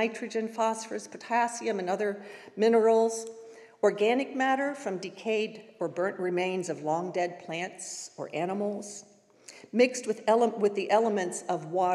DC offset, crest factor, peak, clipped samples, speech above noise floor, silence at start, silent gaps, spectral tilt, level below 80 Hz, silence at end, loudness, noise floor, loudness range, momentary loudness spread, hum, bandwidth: under 0.1%; 18 dB; -10 dBFS; under 0.1%; 25 dB; 0 s; none; -4.5 dB/octave; under -90 dBFS; 0 s; -29 LUFS; -53 dBFS; 5 LU; 13 LU; none; 12.5 kHz